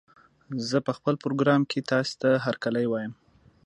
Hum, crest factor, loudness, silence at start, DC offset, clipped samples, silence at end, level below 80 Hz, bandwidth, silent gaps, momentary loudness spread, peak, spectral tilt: none; 18 dB; -26 LUFS; 0.5 s; under 0.1%; under 0.1%; 0.55 s; -70 dBFS; 11 kHz; none; 10 LU; -8 dBFS; -6 dB/octave